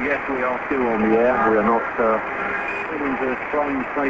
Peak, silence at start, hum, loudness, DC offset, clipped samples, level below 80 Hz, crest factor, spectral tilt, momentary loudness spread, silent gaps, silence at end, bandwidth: -4 dBFS; 0 s; none; -21 LUFS; under 0.1%; under 0.1%; -48 dBFS; 16 dB; -7.5 dB/octave; 7 LU; none; 0 s; 7.8 kHz